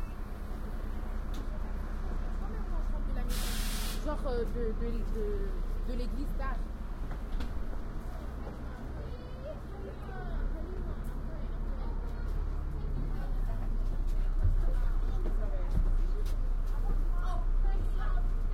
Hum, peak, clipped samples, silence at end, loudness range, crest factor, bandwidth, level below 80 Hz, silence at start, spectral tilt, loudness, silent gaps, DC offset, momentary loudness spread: none; -16 dBFS; under 0.1%; 0 s; 6 LU; 14 dB; 15.5 kHz; -32 dBFS; 0 s; -6 dB/octave; -38 LUFS; none; under 0.1%; 8 LU